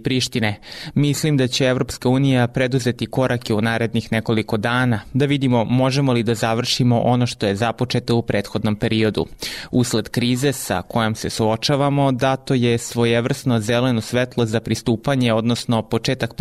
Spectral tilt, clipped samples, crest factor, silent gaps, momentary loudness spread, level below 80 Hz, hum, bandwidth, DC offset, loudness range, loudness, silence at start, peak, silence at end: -5.5 dB/octave; under 0.1%; 12 dB; none; 5 LU; -46 dBFS; none; 15 kHz; under 0.1%; 2 LU; -19 LUFS; 0 s; -8 dBFS; 0.05 s